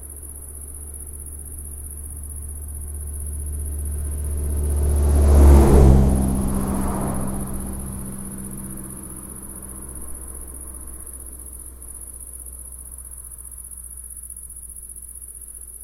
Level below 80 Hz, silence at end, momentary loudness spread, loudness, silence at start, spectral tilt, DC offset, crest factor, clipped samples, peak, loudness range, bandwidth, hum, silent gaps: -24 dBFS; 0 s; 19 LU; -23 LUFS; 0 s; -7 dB/octave; under 0.1%; 22 dB; under 0.1%; 0 dBFS; 17 LU; 16 kHz; none; none